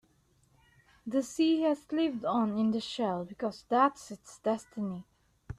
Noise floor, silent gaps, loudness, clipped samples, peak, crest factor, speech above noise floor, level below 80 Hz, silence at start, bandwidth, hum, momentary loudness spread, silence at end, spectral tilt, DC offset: -68 dBFS; none; -31 LUFS; under 0.1%; -12 dBFS; 20 dB; 38 dB; -64 dBFS; 1.05 s; 13 kHz; none; 11 LU; 0.05 s; -5.5 dB/octave; under 0.1%